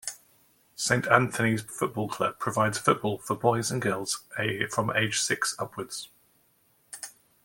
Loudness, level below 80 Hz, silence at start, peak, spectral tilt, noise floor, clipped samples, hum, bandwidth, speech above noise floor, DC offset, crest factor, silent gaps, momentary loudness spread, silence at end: -27 LUFS; -64 dBFS; 0.05 s; -2 dBFS; -4 dB/octave; -66 dBFS; under 0.1%; none; 17 kHz; 39 dB; under 0.1%; 26 dB; none; 17 LU; 0.35 s